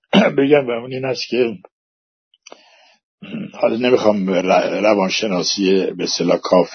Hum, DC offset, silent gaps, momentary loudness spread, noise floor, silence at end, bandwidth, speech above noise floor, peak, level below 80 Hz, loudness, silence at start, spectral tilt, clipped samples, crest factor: none; under 0.1%; 1.72-2.31 s, 3.03-3.18 s; 9 LU; -51 dBFS; 0 s; 6.6 kHz; 34 dB; 0 dBFS; -64 dBFS; -17 LUFS; 0.15 s; -4.5 dB/octave; under 0.1%; 18 dB